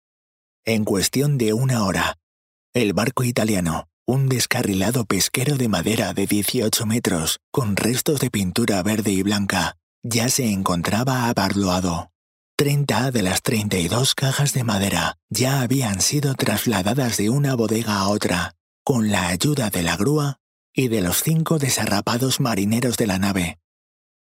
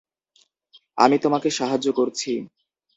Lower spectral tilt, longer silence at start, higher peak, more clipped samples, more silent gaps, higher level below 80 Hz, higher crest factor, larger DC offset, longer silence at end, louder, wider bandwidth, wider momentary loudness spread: about the same, -4.5 dB/octave vs -4 dB/octave; second, 0.65 s vs 0.95 s; about the same, 0 dBFS vs 0 dBFS; neither; first, 2.23-2.73 s, 3.93-4.06 s, 7.43-7.52 s, 9.83-10.02 s, 12.15-12.58 s, 15.23-15.29 s, 18.60-18.86 s, 20.40-20.73 s vs none; first, -50 dBFS vs -68 dBFS; about the same, 20 dB vs 22 dB; neither; first, 0.75 s vs 0.5 s; about the same, -21 LUFS vs -21 LUFS; first, 16.5 kHz vs 8 kHz; second, 5 LU vs 14 LU